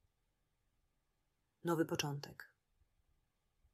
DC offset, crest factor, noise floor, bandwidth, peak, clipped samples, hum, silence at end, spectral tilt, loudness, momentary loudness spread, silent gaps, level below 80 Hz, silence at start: under 0.1%; 24 dB; -84 dBFS; 15.5 kHz; -22 dBFS; under 0.1%; none; 1.3 s; -4.5 dB/octave; -40 LUFS; 16 LU; none; -78 dBFS; 1.65 s